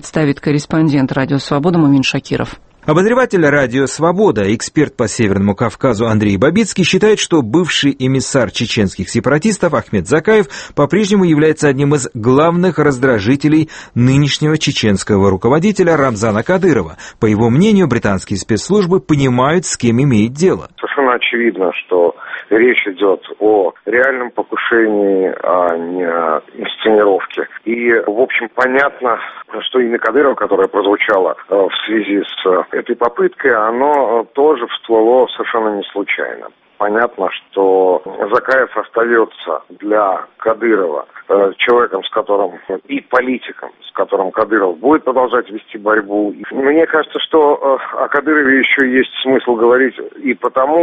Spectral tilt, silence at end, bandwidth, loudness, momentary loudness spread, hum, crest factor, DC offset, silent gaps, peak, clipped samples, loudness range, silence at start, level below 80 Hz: -5.5 dB/octave; 0 s; 8.8 kHz; -13 LUFS; 7 LU; none; 14 dB; under 0.1%; none; 0 dBFS; under 0.1%; 3 LU; 0.05 s; -46 dBFS